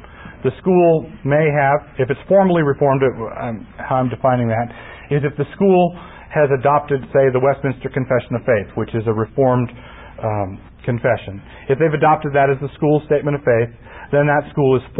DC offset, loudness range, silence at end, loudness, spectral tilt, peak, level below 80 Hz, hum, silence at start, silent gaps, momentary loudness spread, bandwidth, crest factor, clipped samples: under 0.1%; 4 LU; 0 s; -17 LUFS; -13 dB/octave; -4 dBFS; -44 dBFS; none; 0.1 s; none; 12 LU; 4 kHz; 14 dB; under 0.1%